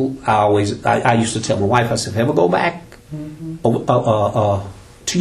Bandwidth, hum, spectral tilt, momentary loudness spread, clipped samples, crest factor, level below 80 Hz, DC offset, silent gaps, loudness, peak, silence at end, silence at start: 14 kHz; none; -5.5 dB/octave; 15 LU; under 0.1%; 16 dB; -46 dBFS; under 0.1%; none; -17 LUFS; 0 dBFS; 0 s; 0 s